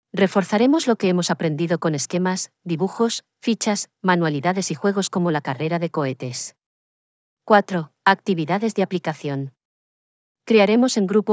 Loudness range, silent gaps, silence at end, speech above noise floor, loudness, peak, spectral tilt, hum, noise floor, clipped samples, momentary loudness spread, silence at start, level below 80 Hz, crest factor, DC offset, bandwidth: 2 LU; 6.66-7.37 s, 9.65-10.35 s; 0 s; over 70 dB; -21 LUFS; -2 dBFS; -5 dB/octave; none; under -90 dBFS; under 0.1%; 10 LU; 0.15 s; -84 dBFS; 18 dB; under 0.1%; 8 kHz